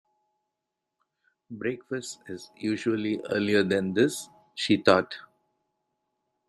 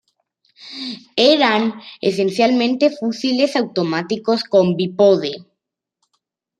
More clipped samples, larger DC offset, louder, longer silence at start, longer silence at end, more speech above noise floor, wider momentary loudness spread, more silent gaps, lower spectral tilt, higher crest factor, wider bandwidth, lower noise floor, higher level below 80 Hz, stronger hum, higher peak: neither; neither; second, -26 LUFS vs -17 LUFS; first, 1.5 s vs 0.6 s; about the same, 1.25 s vs 1.15 s; second, 58 dB vs 62 dB; first, 18 LU vs 13 LU; neither; about the same, -5 dB/octave vs -5.5 dB/octave; first, 26 dB vs 16 dB; first, 14.5 kHz vs 10.5 kHz; first, -85 dBFS vs -79 dBFS; about the same, -72 dBFS vs -68 dBFS; neither; about the same, -4 dBFS vs -2 dBFS